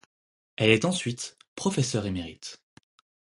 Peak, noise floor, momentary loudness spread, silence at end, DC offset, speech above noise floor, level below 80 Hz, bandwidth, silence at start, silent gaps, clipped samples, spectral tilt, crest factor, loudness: -2 dBFS; under -90 dBFS; 19 LU; 0.75 s; under 0.1%; over 63 dB; -56 dBFS; 11.5 kHz; 0.6 s; 1.48-1.56 s; under 0.1%; -4.5 dB/octave; 26 dB; -27 LUFS